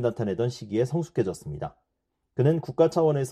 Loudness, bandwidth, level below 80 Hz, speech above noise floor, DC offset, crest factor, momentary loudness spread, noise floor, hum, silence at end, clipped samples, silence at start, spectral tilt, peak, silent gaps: -26 LUFS; 13.5 kHz; -58 dBFS; 54 dB; under 0.1%; 18 dB; 14 LU; -79 dBFS; none; 0 s; under 0.1%; 0 s; -7.5 dB/octave; -8 dBFS; none